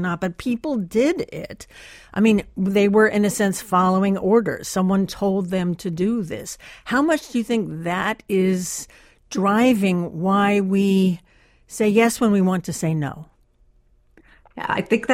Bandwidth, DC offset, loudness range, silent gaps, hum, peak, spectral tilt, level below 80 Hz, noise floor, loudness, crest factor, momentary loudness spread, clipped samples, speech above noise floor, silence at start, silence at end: 16 kHz; under 0.1%; 4 LU; none; none; -4 dBFS; -6 dB/octave; -52 dBFS; -57 dBFS; -20 LUFS; 16 dB; 14 LU; under 0.1%; 37 dB; 0 s; 0 s